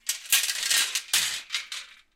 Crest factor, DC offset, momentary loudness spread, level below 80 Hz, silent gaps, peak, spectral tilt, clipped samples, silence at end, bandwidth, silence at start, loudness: 22 dB; under 0.1%; 11 LU; -70 dBFS; none; -8 dBFS; 4 dB/octave; under 0.1%; 0.25 s; 17 kHz; 0.05 s; -24 LUFS